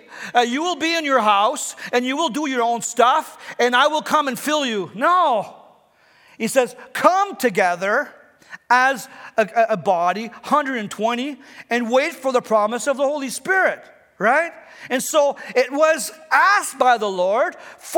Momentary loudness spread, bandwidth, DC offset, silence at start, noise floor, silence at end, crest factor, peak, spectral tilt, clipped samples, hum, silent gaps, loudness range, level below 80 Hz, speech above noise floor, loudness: 9 LU; 19.5 kHz; under 0.1%; 0.1 s; -55 dBFS; 0 s; 20 dB; 0 dBFS; -2.5 dB/octave; under 0.1%; none; none; 3 LU; -76 dBFS; 36 dB; -19 LUFS